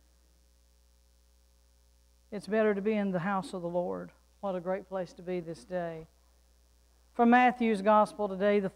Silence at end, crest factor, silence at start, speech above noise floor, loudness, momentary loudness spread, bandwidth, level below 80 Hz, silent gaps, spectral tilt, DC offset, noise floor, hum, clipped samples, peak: 0.05 s; 20 dB; 2.3 s; 35 dB; -30 LUFS; 17 LU; 11.5 kHz; -64 dBFS; none; -7 dB/octave; under 0.1%; -64 dBFS; 60 Hz at -60 dBFS; under 0.1%; -12 dBFS